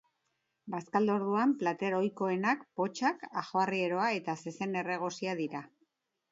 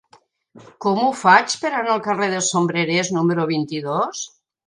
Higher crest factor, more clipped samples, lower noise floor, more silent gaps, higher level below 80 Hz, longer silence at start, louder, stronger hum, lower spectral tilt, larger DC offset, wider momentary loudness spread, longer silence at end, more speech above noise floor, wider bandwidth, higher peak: about the same, 18 dB vs 20 dB; neither; first, -81 dBFS vs -55 dBFS; neither; second, -82 dBFS vs -68 dBFS; about the same, 0.65 s vs 0.55 s; second, -33 LUFS vs -19 LUFS; neither; first, -5.5 dB/octave vs -4 dB/octave; neither; about the same, 9 LU vs 10 LU; first, 0.65 s vs 0.4 s; first, 49 dB vs 36 dB; second, 8 kHz vs 11 kHz; second, -14 dBFS vs 0 dBFS